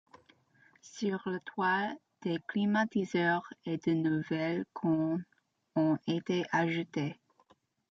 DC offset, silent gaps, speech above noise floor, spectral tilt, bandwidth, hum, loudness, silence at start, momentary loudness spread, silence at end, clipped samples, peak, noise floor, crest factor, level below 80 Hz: under 0.1%; none; 36 dB; -6.5 dB/octave; 7.6 kHz; none; -33 LUFS; 0.85 s; 8 LU; 0.8 s; under 0.1%; -18 dBFS; -68 dBFS; 16 dB; -76 dBFS